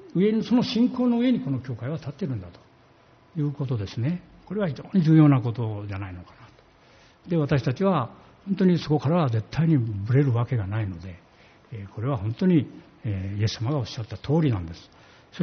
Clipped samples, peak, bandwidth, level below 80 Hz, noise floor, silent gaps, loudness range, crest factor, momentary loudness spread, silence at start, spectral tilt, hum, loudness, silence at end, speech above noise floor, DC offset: under 0.1%; -6 dBFS; 6.6 kHz; -56 dBFS; -56 dBFS; none; 5 LU; 18 dB; 16 LU; 0 s; -7.5 dB/octave; none; -25 LUFS; 0 s; 32 dB; under 0.1%